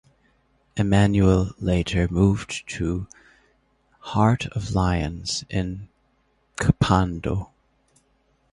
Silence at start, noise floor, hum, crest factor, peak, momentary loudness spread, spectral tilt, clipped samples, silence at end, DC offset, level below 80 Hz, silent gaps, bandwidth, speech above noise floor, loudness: 0.75 s; -66 dBFS; none; 22 dB; -2 dBFS; 13 LU; -6.5 dB/octave; under 0.1%; 1.05 s; under 0.1%; -36 dBFS; none; 11.5 kHz; 44 dB; -23 LUFS